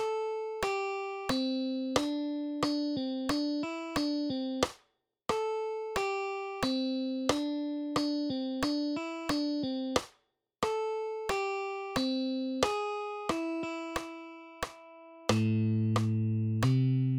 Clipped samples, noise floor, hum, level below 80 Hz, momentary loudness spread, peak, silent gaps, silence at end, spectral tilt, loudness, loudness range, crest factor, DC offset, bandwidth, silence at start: under 0.1%; -74 dBFS; none; -58 dBFS; 7 LU; -10 dBFS; none; 0 s; -6 dB/octave; -33 LUFS; 2 LU; 22 dB; under 0.1%; 17.5 kHz; 0 s